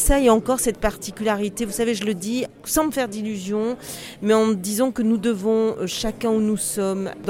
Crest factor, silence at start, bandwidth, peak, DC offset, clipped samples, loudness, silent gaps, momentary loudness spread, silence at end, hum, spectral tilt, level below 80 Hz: 16 dB; 0 s; 16.5 kHz; -6 dBFS; under 0.1%; under 0.1%; -22 LUFS; none; 8 LU; 0 s; none; -4.5 dB/octave; -36 dBFS